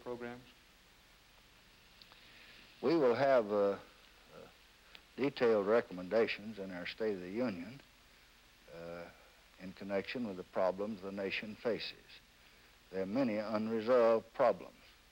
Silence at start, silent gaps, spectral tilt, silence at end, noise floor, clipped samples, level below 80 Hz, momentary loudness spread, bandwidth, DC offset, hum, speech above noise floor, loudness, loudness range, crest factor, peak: 0.05 s; none; -6.5 dB/octave; 0.45 s; -64 dBFS; under 0.1%; -70 dBFS; 25 LU; 16 kHz; under 0.1%; none; 29 dB; -35 LUFS; 8 LU; 18 dB; -18 dBFS